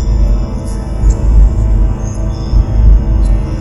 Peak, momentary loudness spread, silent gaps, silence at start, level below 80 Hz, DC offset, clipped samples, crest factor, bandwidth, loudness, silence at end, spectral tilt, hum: 0 dBFS; 8 LU; none; 0 s; -10 dBFS; under 0.1%; 0.4%; 10 dB; 7.8 kHz; -13 LUFS; 0 s; -8 dB/octave; none